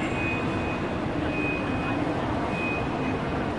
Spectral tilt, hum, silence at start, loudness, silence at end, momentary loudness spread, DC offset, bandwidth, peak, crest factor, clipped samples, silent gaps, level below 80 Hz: -7 dB/octave; none; 0 s; -27 LUFS; 0 s; 2 LU; 0.2%; 11.5 kHz; -16 dBFS; 12 dB; under 0.1%; none; -42 dBFS